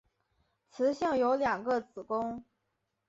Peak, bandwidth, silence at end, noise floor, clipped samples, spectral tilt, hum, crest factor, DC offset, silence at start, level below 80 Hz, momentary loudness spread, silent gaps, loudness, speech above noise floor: -18 dBFS; 7.8 kHz; 0.65 s; -82 dBFS; under 0.1%; -5.5 dB/octave; none; 16 dB; under 0.1%; 0.75 s; -68 dBFS; 9 LU; none; -31 LUFS; 51 dB